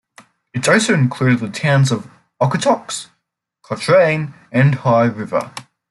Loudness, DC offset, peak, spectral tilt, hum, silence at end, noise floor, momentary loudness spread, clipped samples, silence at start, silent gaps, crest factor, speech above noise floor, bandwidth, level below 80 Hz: -16 LUFS; under 0.1%; -2 dBFS; -5.5 dB/octave; none; 0.3 s; -74 dBFS; 14 LU; under 0.1%; 0.55 s; none; 16 dB; 58 dB; 12 kHz; -58 dBFS